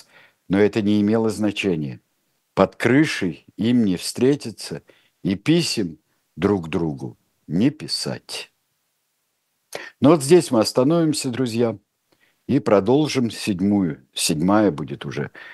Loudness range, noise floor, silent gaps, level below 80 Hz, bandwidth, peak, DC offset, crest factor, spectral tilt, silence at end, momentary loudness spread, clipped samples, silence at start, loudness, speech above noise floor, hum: 6 LU; -72 dBFS; none; -58 dBFS; 12.5 kHz; 0 dBFS; under 0.1%; 20 dB; -5.5 dB/octave; 0 s; 15 LU; under 0.1%; 0.5 s; -20 LUFS; 52 dB; none